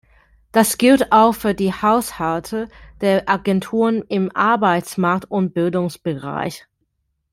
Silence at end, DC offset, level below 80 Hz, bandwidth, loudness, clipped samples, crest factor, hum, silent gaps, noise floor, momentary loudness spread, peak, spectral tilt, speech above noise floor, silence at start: 0.75 s; under 0.1%; -50 dBFS; 16.5 kHz; -18 LUFS; under 0.1%; 16 dB; none; none; -71 dBFS; 12 LU; -2 dBFS; -5.5 dB/octave; 53 dB; 0.55 s